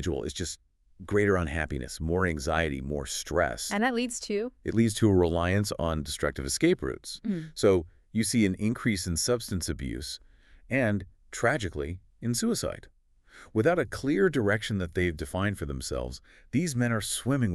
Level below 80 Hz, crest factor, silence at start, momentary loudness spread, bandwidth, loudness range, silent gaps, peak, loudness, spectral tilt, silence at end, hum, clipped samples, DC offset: -44 dBFS; 18 dB; 0 s; 10 LU; 13.5 kHz; 3 LU; none; -10 dBFS; -29 LUFS; -5 dB/octave; 0 s; none; under 0.1%; under 0.1%